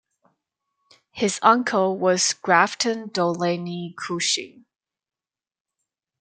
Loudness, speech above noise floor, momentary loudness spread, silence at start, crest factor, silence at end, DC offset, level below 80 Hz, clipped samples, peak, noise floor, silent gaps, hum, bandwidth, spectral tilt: -21 LUFS; over 68 dB; 12 LU; 1.15 s; 22 dB; 1.7 s; under 0.1%; -72 dBFS; under 0.1%; -2 dBFS; under -90 dBFS; none; none; 9.6 kHz; -3 dB/octave